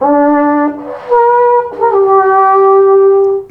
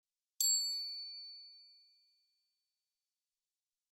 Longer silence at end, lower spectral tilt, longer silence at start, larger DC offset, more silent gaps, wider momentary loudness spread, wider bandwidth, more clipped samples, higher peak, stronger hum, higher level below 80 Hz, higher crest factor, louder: second, 0.05 s vs 2.25 s; first, -8 dB/octave vs 10.5 dB/octave; second, 0 s vs 0.4 s; neither; neither; second, 6 LU vs 21 LU; second, 3.3 kHz vs 19.5 kHz; neither; first, 0 dBFS vs -20 dBFS; neither; first, -54 dBFS vs under -90 dBFS; second, 8 dB vs 24 dB; first, -9 LUFS vs -34 LUFS